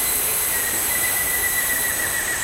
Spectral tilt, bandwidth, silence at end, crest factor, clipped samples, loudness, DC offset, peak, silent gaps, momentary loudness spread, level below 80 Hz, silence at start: 0 dB/octave; 16 kHz; 0 s; 14 dB; under 0.1%; -19 LUFS; under 0.1%; -8 dBFS; none; 1 LU; -44 dBFS; 0 s